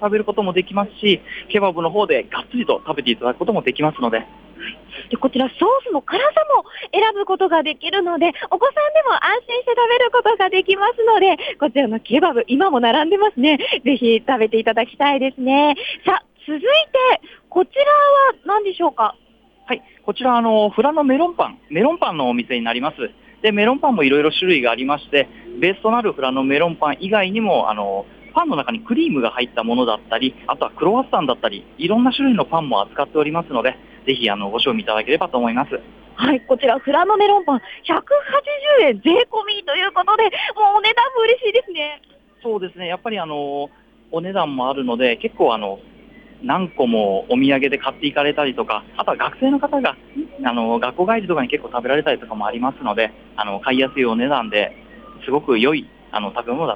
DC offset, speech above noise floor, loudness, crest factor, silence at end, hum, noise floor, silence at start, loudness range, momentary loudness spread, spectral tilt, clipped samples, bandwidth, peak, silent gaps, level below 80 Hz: under 0.1%; 26 dB; -18 LUFS; 14 dB; 0 s; none; -44 dBFS; 0 s; 4 LU; 10 LU; -7 dB/octave; under 0.1%; 5.6 kHz; -4 dBFS; none; -56 dBFS